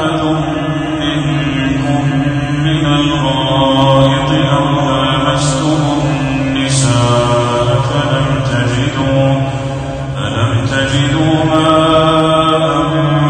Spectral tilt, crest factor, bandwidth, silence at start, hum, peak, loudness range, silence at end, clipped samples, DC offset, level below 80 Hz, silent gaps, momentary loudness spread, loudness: -5.5 dB/octave; 12 dB; 9.6 kHz; 0 s; none; 0 dBFS; 2 LU; 0 s; under 0.1%; under 0.1%; -32 dBFS; none; 6 LU; -12 LUFS